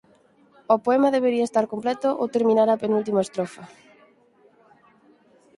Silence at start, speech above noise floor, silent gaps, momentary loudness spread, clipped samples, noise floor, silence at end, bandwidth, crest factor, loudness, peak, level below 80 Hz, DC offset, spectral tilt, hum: 0.7 s; 36 dB; none; 9 LU; under 0.1%; -58 dBFS; 1.9 s; 11.5 kHz; 20 dB; -22 LUFS; -4 dBFS; -72 dBFS; under 0.1%; -6 dB/octave; none